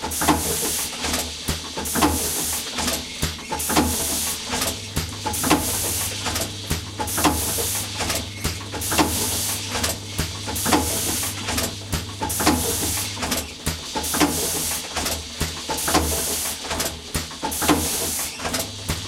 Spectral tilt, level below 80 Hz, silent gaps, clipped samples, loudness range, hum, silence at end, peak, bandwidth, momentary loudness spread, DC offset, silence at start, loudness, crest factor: -2.5 dB/octave; -38 dBFS; none; under 0.1%; 1 LU; none; 0 s; 0 dBFS; 17 kHz; 7 LU; under 0.1%; 0 s; -22 LUFS; 24 dB